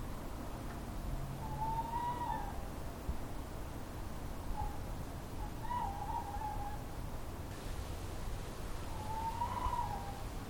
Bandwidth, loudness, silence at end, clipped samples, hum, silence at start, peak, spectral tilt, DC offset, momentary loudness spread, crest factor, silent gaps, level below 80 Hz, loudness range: 20 kHz; -43 LUFS; 0 s; under 0.1%; none; 0 s; -24 dBFS; -5.5 dB/octave; under 0.1%; 7 LU; 18 dB; none; -46 dBFS; 2 LU